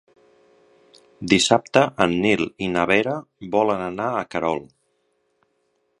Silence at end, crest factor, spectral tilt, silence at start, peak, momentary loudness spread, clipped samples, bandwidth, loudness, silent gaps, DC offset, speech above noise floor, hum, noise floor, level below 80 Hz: 1.35 s; 22 dB; -4 dB/octave; 1.2 s; 0 dBFS; 9 LU; under 0.1%; 11 kHz; -21 LUFS; none; under 0.1%; 48 dB; none; -69 dBFS; -54 dBFS